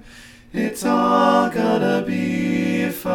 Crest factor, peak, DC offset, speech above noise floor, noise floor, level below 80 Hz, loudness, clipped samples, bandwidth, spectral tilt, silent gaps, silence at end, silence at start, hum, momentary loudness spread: 16 dB; -2 dBFS; under 0.1%; 25 dB; -43 dBFS; -52 dBFS; -19 LUFS; under 0.1%; 19 kHz; -6 dB/octave; none; 0 s; 0.05 s; none; 8 LU